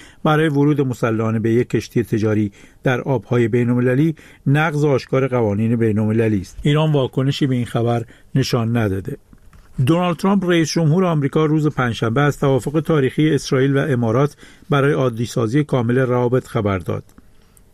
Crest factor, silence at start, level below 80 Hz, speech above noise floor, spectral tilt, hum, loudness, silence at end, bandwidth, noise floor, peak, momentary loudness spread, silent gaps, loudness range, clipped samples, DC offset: 12 dB; 0 s; -46 dBFS; 31 dB; -7 dB/octave; none; -18 LUFS; 0.7 s; 14.5 kHz; -48 dBFS; -4 dBFS; 5 LU; none; 2 LU; under 0.1%; under 0.1%